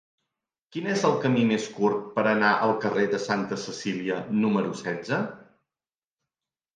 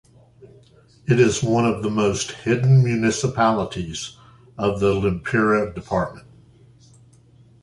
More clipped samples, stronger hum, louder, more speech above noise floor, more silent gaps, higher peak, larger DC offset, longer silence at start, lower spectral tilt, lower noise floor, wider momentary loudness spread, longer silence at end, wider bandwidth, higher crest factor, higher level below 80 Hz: neither; neither; second, -26 LUFS vs -20 LUFS; first, over 65 dB vs 32 dB; neither; second, -8 dBFS vs -4 dBFS; neither; first, 0.75 s vs 0.45 s; about the same, -5.5 dB/octave vs -6 dB/octave; first, under -90 dBFS vs -52 dBFS; second, 9 LU vs 12 LU; about the same, 1.35 s vs 1.45 s; second, 9.4 kHz vs 11.5 kHz; about the same, 18 dB vs 18 dB; second, -72 dBFS vs -46 dBFS